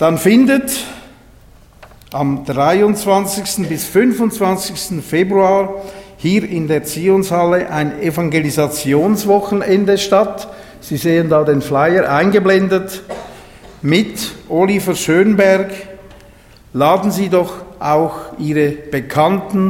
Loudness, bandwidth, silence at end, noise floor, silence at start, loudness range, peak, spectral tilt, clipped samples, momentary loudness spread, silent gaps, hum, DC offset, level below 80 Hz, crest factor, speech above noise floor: -14 LUFS; 17 kHz; 0 s; -43 dBFS; 0 s; 2 LU; 0 dBFS; -5.5 dB/octave; under 0.1%; 12 LU; none; none; under 0.1%; -46 dBFS; 14 dB; 29 dB